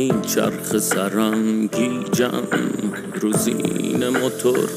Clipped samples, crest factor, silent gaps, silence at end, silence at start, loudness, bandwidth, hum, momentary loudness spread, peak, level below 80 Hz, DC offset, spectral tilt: under 0.1%; 16 dB; none; 0 s; 0 s; -21 LUFS; 16 kHz; none; 3 LU; -4 dBFS; -58 dBFS; under 0.1%; -4.5 dB/octave